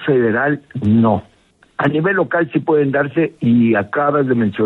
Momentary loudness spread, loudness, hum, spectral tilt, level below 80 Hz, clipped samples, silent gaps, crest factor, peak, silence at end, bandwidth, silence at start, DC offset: 6 LU; -16 LUFS; none; -9.5 dB/octave; -56 dBFS; under 0.1%; none; 14 dB; -2 dBFS; 0 s; 4.1 kHz; 0 s; under 0.1%